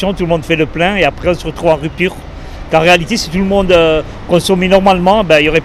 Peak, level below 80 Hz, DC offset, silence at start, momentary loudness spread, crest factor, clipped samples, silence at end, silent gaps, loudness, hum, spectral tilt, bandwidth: 0 dBFS; -28 dBFS; under 0.1%; 0 s; 8 LU; 12 dB; 0.3%; 0 s; none; -11 LUFS; none; -5 dB/octave; 15.5 kHz